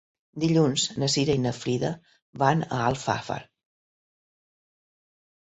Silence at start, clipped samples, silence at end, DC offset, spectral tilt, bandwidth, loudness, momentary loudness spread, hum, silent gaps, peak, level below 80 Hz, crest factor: 0.35 s; under 0.1%; 2.05 s; under 0.1%; -5 dB/octave; 8.4 kHz; -25 LUFS; 12 LU; none; 2.22-2.33 s; -6 dBFS; -58 dBFS; 22 dB